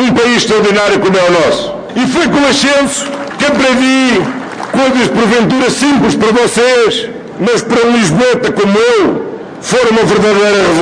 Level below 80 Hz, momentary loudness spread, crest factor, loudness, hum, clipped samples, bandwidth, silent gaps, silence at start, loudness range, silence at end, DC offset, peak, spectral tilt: -42 dBFS; 8 LU; 8 dB; -9 LUFS; none; under 0.1%; 10 kHz; none; 0 s; 1 LU; 0 s; under 0.1%; 0 dBFS; -4 dB/octave